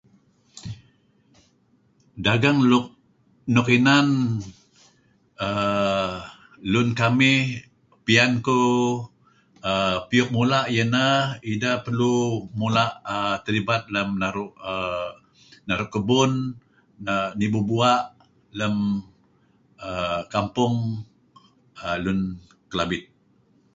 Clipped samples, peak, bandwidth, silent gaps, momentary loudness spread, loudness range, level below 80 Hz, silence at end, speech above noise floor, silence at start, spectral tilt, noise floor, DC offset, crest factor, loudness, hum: under 0.1%; -4 dBFS; 7.8 kHz; none; 17 LU; 6 LU; -54 dBFS; 0.75 s; 41 dB; 0.55 s; -5.5 dB/octave; -62 dBFS; under 0.1%; 20 dB; -22 LUFS; none